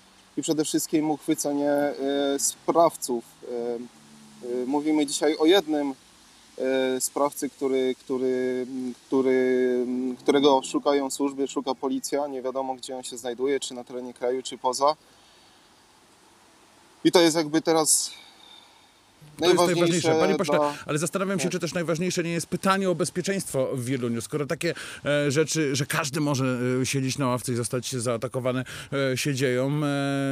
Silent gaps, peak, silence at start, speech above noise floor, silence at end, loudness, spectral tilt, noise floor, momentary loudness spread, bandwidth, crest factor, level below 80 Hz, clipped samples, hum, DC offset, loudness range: none; -4 dBFS; 0.35 s; 32 dB; 0 s; -25 LUFS; -4.5 dB/octave; -57 dBFS; 10 LU; 16 kHz; 22 dB; -68 dBFS; under 0.1%; none; under 0.1%; 5 LU